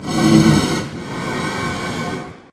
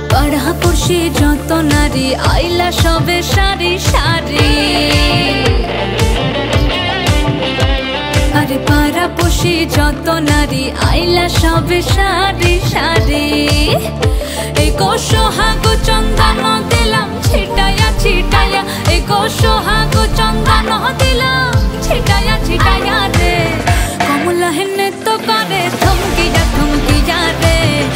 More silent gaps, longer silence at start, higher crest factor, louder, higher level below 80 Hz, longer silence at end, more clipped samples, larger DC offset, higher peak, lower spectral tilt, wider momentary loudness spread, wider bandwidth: neither; about the same, 0 s vs 0 s; first, 18 dB vs 12 dB; second, -18 LUFS vs -12 LUFS; second, -40 dBFS vs -18 dBFS; about the same, 0.1 s vs 0 s; neither; second, under 0.1% vs 0.1%; about the same, 0 dBFS vs 0 dBFS; about the same, -5.5 dB/octave vs -4.5 dB/octave; first, 14 LU vs 3 LU; second, 14.5 kHz vs 16.5 kHz